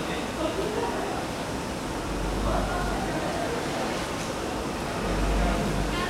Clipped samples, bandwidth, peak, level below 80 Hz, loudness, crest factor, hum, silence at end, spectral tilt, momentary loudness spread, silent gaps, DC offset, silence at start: under 0.1%; 16 kHz; -12 dBFS; -34 dBFS; -29 LUFS; 16 dB; none; 0 s; -5 dB/octave; 5 LU; none; under 0.1%; 0 s